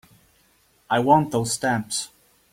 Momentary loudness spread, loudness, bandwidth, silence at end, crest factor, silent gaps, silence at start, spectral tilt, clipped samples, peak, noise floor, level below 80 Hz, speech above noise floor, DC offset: 10 LU; -22 LUFS; 16.5 kHz; 0.45 s; 20 dB; none; 0.9 s; -4.5 dB/octave; under 0.1%; -4 dBFS; -61 dBFS; -60 dBFS; 40 dB; under 0.1%